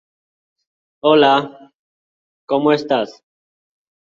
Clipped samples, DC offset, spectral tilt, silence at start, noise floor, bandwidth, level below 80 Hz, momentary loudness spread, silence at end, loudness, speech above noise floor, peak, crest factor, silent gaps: under 0.1%; under 0.1%; -6 dB/octave; 1.05 s; under -90 dBFS; 7.2 kHz; -66 dBFS; 12 LU; 1.05 s; -16 LUFS; over 75 dB; -2 dBFS; 18 dB; 1.75-2.47 s